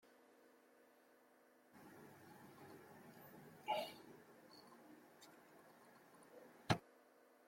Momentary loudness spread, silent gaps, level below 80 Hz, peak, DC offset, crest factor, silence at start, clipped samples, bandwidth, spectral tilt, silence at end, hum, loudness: 25 LU; none; -82 dBFS; -22 dBFS; under 0.1%; 32 dB; 0.05 s; under 0.1%; 16.5 kHz; -5 dB/octave; 0 s; none; -49 LUFS